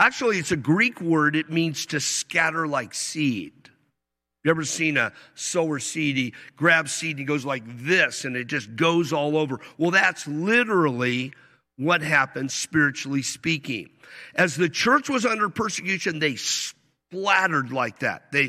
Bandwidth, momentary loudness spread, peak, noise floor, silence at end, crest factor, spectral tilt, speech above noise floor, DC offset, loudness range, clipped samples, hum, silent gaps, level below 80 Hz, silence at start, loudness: 15 kHz; 9 LU; -4 dBFS; -83 dBFS; 0 s; 20 dB; -4 dB/octave; 59 dB; under 0.1%; 3 LU; under 0.1%; none; none; -66 dBFS; 0 s; -23 LUFS